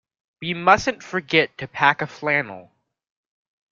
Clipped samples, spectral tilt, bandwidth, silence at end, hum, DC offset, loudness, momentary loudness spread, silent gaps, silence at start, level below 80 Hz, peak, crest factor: under 0.1%; -4.5 dB/octave; 7.6 kHz; 1.1 s; none; under 0.1%; -20 LUFS; 12 LU; none; 0.4 s; -56 dBFS; -2 dBFS; 22 dB